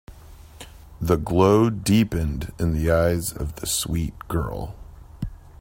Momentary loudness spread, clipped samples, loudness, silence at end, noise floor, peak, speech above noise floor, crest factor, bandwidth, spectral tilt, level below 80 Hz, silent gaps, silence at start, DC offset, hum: 20 LU; under 0.1%; -22 LUFS; 0.1 s; -44 dBFS; -4 dBFS; 23 dB; 20 dB; 16.5 kHz; -5.5 dB/octave; -36 dBFS; none; 0.1 s; under 0.1%; none